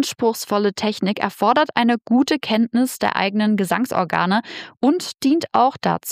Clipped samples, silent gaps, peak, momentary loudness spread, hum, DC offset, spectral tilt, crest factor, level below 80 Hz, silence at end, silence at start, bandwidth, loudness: under 0.1%; none; -2 dBFS; 4 LU; none; under 0.1%; -4.5 dB/octave; 18 dB; -62 dBFS; 0 s; 0 s; 15.5 kHz; -19 LUFS